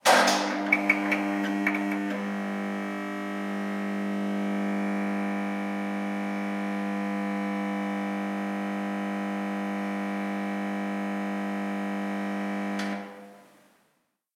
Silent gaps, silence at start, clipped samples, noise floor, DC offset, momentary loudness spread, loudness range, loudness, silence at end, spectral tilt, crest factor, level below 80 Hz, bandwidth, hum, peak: none; 0.05 s; under 0.1%; -73 dBFS; under 0.1%; 7 LU; 4 LU; -29 LUFS; 0.95 s; -5 dB/octave; 24 dB; -84 dBFS; 16 kHz; none; -6 dBFS